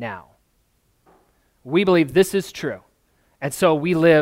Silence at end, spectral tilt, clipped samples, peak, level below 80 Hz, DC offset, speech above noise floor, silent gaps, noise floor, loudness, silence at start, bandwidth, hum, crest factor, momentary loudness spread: 0 s; -5.5 dB/octave; under 0.1%; -4 dBFS; -56 dBFS; under 0.1%; 46 dB; none; -65 dBFS; -20 LUFS; 0 s; 16 kHz; none; 18 dB; 15 LU